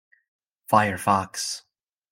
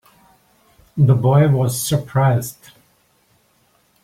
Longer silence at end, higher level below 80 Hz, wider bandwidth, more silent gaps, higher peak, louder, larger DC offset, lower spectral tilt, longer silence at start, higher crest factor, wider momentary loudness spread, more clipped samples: second, 0.55 s vs 1.5 s; second, -68 dBFS vs -52 dBFS; about the same, 16.5 kHz vs 16 kHz; neither; about the same, -4 dBFS vs -4 dBFS; second, -23 LUFS vs -16 LUFS; neither; second, -4 dB/octave vs -6.5 dB/octave; second, 0.7 s vs 0.95 s; first, 22 dB vs 16 dB; about the same, 10 LU vs 11 LU; neither